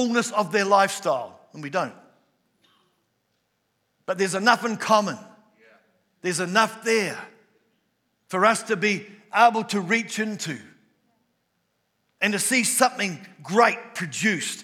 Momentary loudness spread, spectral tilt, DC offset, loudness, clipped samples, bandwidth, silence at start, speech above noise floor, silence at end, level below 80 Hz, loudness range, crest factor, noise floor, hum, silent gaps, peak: 13 LU; -3 dB/octave; under 0.1%; -23 LUFS; under 0.1%; 17.5 kHz; 0 s; 50 dB; 0 s; -88 dBFS; 4 LU; 22 dB; -73 dBFS; none; none; -2 dBFS